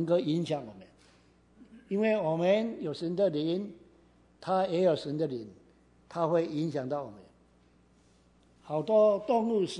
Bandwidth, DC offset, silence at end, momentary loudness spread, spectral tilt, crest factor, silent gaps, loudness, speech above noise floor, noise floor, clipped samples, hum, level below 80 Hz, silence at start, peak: 11 kHz; under 0.1%; 0 s; 14 LU; -7 dB/octave; 18 dB; none; -30 LUFS; 34 dB; -63 dBFS; under 0.1%; none; -70 dBFS; 0 s; -14 dBFS